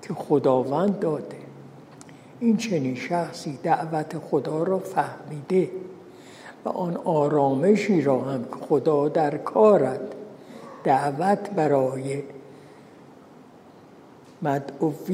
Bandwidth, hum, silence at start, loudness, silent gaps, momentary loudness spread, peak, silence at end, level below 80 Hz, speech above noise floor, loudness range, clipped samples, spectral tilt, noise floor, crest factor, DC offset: 15 kHz; none; 0 s; -24 LUFS; none; 18 LU; -6 dBFS; 0 s; -72 dBFS; 26 dB; 6 LU; under 0.1%; -7 dB/octave; -49 dBFS; 18 dB; under 0.1%